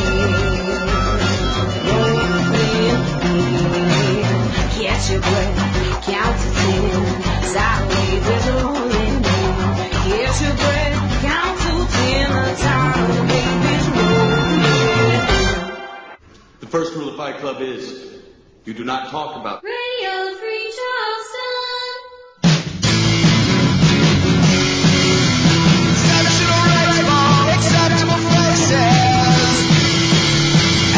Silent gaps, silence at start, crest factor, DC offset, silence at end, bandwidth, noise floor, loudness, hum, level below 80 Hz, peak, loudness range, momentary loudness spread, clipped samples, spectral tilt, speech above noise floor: none; 0 s; 14 dB; under 0.1%; 0 s; 8 kHz; -44 dBFS; -16 LUFS; none; -28 dBFS; -2 dBFS; 11 LU; 11 LU; under 0.1%; -4.5 dB/octave; 19 dB